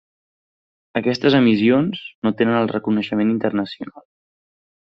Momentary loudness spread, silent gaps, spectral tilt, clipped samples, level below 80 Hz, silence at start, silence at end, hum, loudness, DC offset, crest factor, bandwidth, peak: 12 LU; 2.15-2.22 s; -5 dB/octave; under 0.1%; -60 dBFS; 0.95 s; 0.95 s; none; -19 LUFS; under 0.1%; 18 dB; 6.4 kHz; -2 dBFS